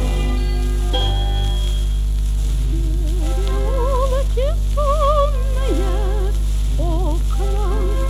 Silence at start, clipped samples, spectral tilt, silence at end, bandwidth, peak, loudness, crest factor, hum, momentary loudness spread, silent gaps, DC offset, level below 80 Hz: 0 s; under 0.1%; -6 dB/octave; 0 s; 12.5 kHz; -4 dBFS; -20 LUFS; 12 dB; 50 Hz at -15 dBFS; 4 LU; none; under 0.1%; -18 dBFS